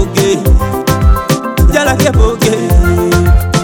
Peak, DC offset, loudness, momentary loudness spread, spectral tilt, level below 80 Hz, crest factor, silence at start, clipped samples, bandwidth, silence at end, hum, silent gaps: 0 dBFS; under 0.1%; -11 LUFS; 3 LU; -5.5 dB/octave; -12 dBFS; 8 dB; 0 s; 0.5%; 18 kHz; 0 s; none; none